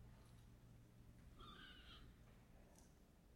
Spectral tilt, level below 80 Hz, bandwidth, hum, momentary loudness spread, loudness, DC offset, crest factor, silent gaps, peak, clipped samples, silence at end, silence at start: -4.5 dB/octave; -68 dBFS; 16.5 kHz; none; 8 LU; -65 LUFS; under 0.1%; 16 dB; none; -48 dBFS; under 0.1%; 0 s; 0 s